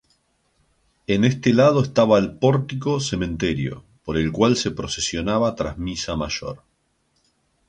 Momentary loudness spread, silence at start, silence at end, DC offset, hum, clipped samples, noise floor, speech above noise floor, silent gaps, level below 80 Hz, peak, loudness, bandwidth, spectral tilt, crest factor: 11 LU; 1.1 s; 1.1 s; under 0.1%; none; under 0.1%; -67 dBFS; 47 dB; none; -44 dBFS; -4 dBFS; -21 LUFS; 9.8 kHz; -5.5 dB/octave; 18 dB